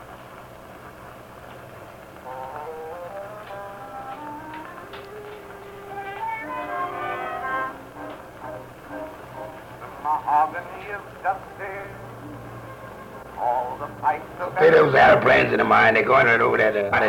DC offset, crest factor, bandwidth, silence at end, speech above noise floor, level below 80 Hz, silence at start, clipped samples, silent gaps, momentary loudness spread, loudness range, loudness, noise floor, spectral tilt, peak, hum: under 0.1%; 18 dB; 18 kHz; 0 s; 23 dB; -54 dBFS; 0 s; under 0.1%; none; 25 LU; 19 LU; -20 LUFS; -42 dBFS; -6 dB/octave; -4 dBFS; none